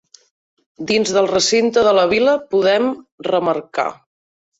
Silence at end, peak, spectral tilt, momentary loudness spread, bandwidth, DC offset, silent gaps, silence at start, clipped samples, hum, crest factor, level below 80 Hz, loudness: 0.65 s; -2 dBFS; -3.5 dB/octave; 9 LU; 8 kHz; under 0.1%; 3.12-3.18 s; 0.8 s; under 0.1%; none; 14 dB; -56 dBFS; -16 LUFS